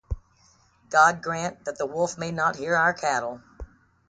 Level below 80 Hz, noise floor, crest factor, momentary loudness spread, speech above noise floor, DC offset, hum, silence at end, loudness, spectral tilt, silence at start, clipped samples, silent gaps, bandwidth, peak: -44 dBFS; -60 dBFS; 20 dB; 17 LU; 36 dB; under 0.1%; none; 0.45 s; -24 LUFS; -4 dB/octave; 0.1 s; under 0.1%; none; 9.4 kHz; -6 dBFS